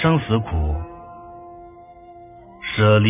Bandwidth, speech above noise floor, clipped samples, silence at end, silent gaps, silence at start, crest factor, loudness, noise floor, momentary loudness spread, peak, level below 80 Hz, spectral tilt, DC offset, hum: 3.8 kHz; 26 dB; under 0.1%; 0 s; none; 0 s; 18 dB; -21 LUFS; -43 dBFS; 25 LU; -2 dBFS; -32 dBFS; -11 dB/octave; under 0.1%; none